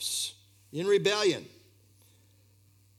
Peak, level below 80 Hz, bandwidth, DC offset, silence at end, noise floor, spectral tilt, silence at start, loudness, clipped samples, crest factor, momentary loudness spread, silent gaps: -12 dBFS; -80 dBFS; 16 kHz; under 0.1%; 1.5 s; -62 dBFS; -3 dB/octave; 0 s; -29 LUFS; under 0.1%; 20 dB; 12 LU; none